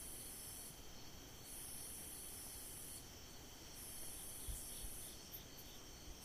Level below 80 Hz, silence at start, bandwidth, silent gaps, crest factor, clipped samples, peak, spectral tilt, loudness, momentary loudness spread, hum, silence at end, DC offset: -60 dBFS; 0 s; 15.5 kHz; none; 16 dB; under 0.1%; -36 dBFS; -2 dB/octave; -51 LUFS; 7 LU; none; 0 s; under 0.1%